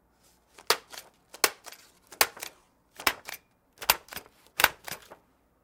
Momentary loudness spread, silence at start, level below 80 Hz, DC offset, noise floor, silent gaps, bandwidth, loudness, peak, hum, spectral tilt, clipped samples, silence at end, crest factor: 20 LU; 0.7 s; -62 dBFS; under 0.1%; -65 dBFS; none; 18 kHz; -28 LUFS; 0 dBFS; none; 0.5 dB/octave; under 0.1%; 0.5 s; 32 dB